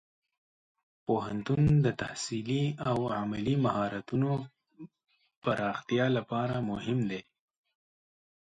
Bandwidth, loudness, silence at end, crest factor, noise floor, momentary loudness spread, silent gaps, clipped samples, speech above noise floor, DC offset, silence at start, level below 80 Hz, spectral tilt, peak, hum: 9.4 kHz; -31 LUFS; 1.25 s; 16 dB; -52 dBFS; 9 LU; 5.37-5.42 s; under 0.1%; 23 dB; under 0.1%; 1.1 s; -58 dBFS; -6.5 dB/octave; -14 dBFS; none